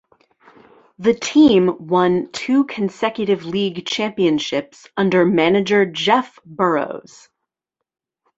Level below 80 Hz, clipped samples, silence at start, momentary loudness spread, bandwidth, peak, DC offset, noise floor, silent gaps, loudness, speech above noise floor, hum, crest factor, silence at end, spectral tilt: -58 dBFS; under 0.1%; 1 s; 9 LU; 8 kHz; -2 dBFS; under 0.1%; -82 dBFS; none; -18 LUFS; 65 dB; none; 16 dB; 1.4 s; -5.5 dB/octave